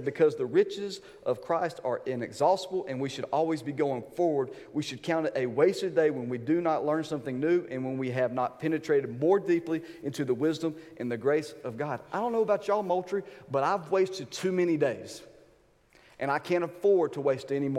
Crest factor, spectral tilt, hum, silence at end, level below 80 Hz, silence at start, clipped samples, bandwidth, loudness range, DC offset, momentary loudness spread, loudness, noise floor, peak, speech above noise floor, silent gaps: 18 dB; -6 dB/octave; none; 0 s; -72 dBFS; 0 s; under 0.1%; 14 kHz; 2 LU; under 0.1%; 9 LU; -29 LUFS; -63 dBFS; -12 dBFS; 34 dB; none